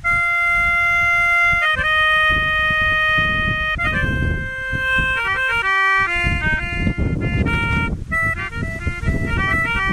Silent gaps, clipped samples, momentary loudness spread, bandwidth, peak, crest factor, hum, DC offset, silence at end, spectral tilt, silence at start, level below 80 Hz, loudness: none; under 0.1%; 8 LU; 14.5 kHz; -6 dBFS; 12 dB; none; under 0.1%; 0 s; -5 dB/octave; 0 s; -28 dBFS; -17 LUFS